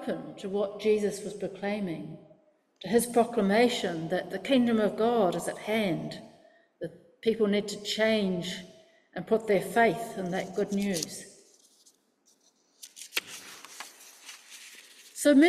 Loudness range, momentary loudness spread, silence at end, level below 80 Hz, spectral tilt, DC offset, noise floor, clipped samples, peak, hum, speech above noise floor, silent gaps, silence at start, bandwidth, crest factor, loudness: 13 LU; 20 LU; 0 s; -68 dBFS; -4.5 dB/octave; under 0.1%; -68 dBFS; under 0.1%; -10 dBFS; none; 40 dB; none; 0 s; 15.5 kHz; 20 dB; -29 LUFS